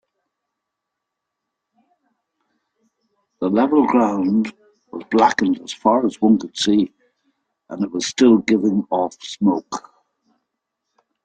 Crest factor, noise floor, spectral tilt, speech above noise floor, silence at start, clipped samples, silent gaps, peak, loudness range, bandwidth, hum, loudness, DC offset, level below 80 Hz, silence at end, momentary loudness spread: 18 dB; -81 dBFS; -5 dB/octave; 63 dB; 3.4 s; under 0.1%; none; -2 dBFS; 4 LU; 9.2 kHz; none; -18 LUFS; under 0.1%; -62 dBFS; 1.45 s; 12 LU